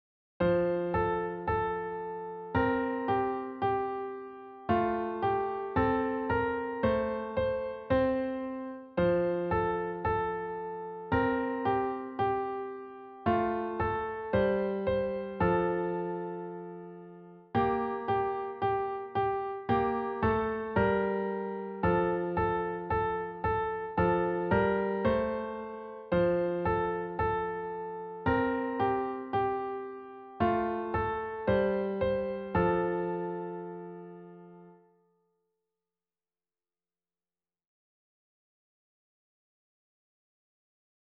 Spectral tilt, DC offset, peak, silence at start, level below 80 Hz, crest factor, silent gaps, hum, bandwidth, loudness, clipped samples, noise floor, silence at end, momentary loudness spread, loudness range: -6 dB/octave; under 0.1%; -14 dBFS; 0.4 s; -52 dBFS; 16 dB; none; none; 5.2 kHz; -31 LUFS; under 0.1%; under -90 dBFS; 6.35 s; 11 LU; 3 LU